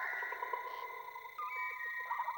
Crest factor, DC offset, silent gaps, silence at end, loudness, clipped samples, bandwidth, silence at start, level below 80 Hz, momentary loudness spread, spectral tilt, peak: 18 dB; under 0.1%; none; 0 s; -41 LUFS; under 0.1%; over 20 kHz; 0 s; -82 dBFS; 7 LU; -1 dB/octave; -24 dBFS